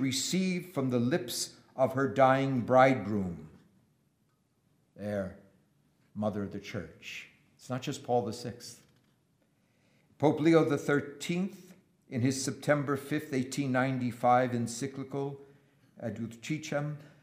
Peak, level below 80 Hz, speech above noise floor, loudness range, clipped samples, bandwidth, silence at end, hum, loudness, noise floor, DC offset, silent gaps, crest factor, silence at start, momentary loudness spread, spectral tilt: -10 dBFS; -72 dBFS; 43 dB; 11 LU; under 0.1%; 15.5 kHz; 0.15 s; none; -31 LUFS; -73 dBFS; under 0.1%; none; 22 dB; 0 s; 16 LU; -5.5 dB/octave